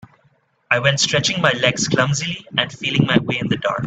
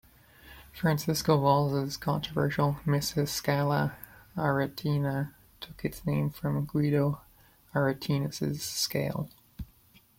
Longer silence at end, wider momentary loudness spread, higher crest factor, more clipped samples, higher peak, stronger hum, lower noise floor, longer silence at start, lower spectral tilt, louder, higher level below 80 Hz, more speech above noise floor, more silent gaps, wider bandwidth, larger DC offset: second, 0 s vs 0.55 s; second, 5 LU vs 15 LU; about the same, 20 dB vs 20 dB; neither; first, 0 dBFS vs -10 dBFS; neither; about the same, -60 dBFS vs -61 dBFS; first, 0.7 s vs 0.45 s; second, -4 dB/octave vs -5.5 dB/octave; first, -18 LUFS vs -29 LUFS; about the same, -52 dBFS vs -56 dBFS; first, 42 dB vs 32 dB; neither; second, 9 kHz vs 16.5 kHz; neither